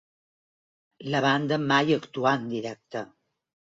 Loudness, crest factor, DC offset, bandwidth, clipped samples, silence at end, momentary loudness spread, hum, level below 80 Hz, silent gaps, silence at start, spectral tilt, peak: -25 LUFS; 18 dB; under 0.1%; 7.8 kHz; under 0.1%; 0.7 s; 14 LU; none; -70 dBFS; none; 1 s; -5.5 dB/octave; -10 dBFS